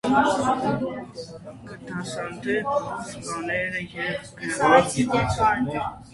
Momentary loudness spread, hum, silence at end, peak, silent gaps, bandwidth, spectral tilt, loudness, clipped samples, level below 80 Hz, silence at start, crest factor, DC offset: 18 LU; none; 0.05 s; -4 dBFS; none; 11.5 kHz; -5 dB/octave; -24 LUFS; under 0.1%; -48 dBFS; 0.05 s; 22 dB; under 0.1%